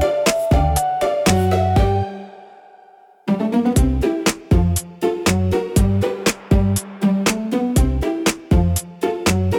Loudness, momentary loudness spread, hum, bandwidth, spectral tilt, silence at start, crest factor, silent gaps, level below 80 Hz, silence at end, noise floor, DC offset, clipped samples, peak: -18 LUFS; 5 LU; none; 18 kHz; -5.5 dB/octave; 0 s; 14 dB; none; -26 dBFS; 0 s; -48 dBFS; under 0.1%; under 0.1%; -4 dBFS